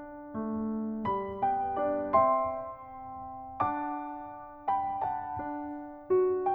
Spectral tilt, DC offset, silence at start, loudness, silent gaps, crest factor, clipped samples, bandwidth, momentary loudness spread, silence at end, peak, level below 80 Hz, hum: -10 dB/octave; under 0.1%; 0 s; -31 LUFS; none; 20 dB; under 0.1%; 4.5 kHz; 16 LU; 0 s; -12 dBFS; -60 dBFS; none